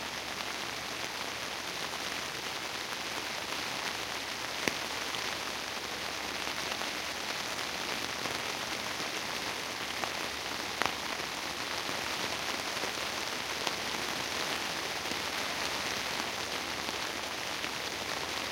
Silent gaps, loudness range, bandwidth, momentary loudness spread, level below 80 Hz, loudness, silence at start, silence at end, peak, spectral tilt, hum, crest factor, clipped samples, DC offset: none; 2 LU; 17 kHz; 3 LU; -62 dBFS; -34 LUFS; 0 s; 0 s; -6 dBFS; -1 dB/octave; none; 30 dB; under 0.1%; under 0.1%